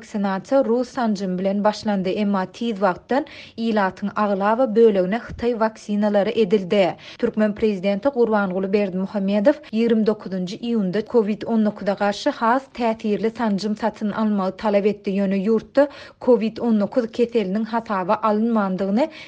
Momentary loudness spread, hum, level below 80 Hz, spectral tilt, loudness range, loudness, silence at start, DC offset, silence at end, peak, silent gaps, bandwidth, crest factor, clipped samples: 5 LU; none; -56 dBFS; -7 dB/octave; 2 LU; -21 LUFS; 0 s; under 0.1%; 0 s; -4 dBFS; none; 8.4 kHz; 16 dB; under 0.1%